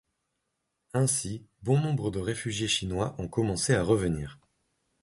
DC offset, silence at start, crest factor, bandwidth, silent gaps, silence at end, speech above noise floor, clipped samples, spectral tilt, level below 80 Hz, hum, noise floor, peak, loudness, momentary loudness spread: under 0.1%; 0.95 s; 20 dB; 12 kHz; none; 0.7 s; 53 dB; under 0.1%; -4.5 dB/octave; -50 dBFS; none; -81 dBFS; -10 dBFS; -29 LUFS; 9 LU